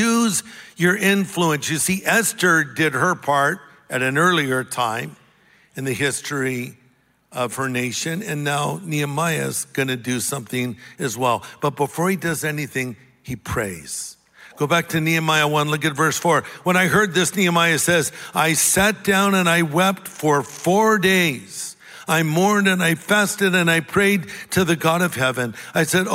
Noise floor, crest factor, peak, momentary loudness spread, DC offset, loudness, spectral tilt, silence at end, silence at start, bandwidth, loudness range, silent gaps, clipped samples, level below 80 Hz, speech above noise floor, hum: -59 dBFS; 18 dB; -2 dBFS; 11 LU; under 0.1%; -19 LUFS; -4 dB/octave; 0 s; 0 s; 16 kHz; 7 LU; none; under 0.1%; -54 dBFS; 39 dB; none